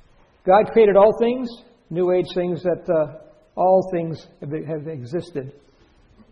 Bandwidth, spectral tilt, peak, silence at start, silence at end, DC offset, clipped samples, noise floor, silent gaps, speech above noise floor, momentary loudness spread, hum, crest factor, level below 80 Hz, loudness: 7 kHz; -8.5 dB/octave; -2 dBFS; 0.45 s; 0.8 s; under 0.1%; under 0.1%; -54 dBFS; none; 35 dB; 18 LU; none; 20 dB; -54 dBFS; -20 LUFS